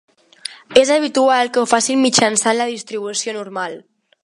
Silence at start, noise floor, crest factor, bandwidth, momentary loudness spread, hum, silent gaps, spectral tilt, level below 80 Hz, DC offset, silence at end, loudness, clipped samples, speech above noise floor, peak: 0.5 s; -36 dBFS; 18 dB; 11.5 kHz; 16 LU; none; none; -2 dB/octave; -62 dBFS; under 0.1%; 0.45 s; -16 LUFS; under 0.1%; 19 dB; 0 dBFS